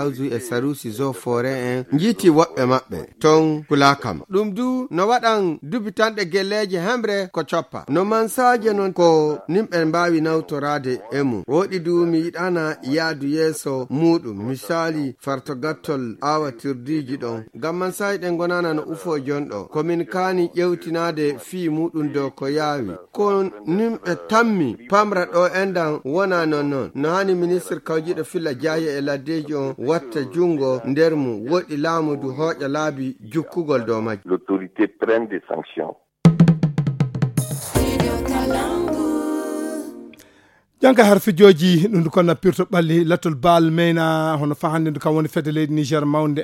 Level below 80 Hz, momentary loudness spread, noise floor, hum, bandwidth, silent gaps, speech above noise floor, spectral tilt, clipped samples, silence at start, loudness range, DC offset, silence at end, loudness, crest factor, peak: -46 dBFS; 10 LU; -55 dBFS; none; 16.5 kHz; none; 36 dB; -6 dB/octave; under 0.1%; 0 s; 6 LU; under 0.1%; 0 s; -20 LUFS; 20 dB; 0 dBFS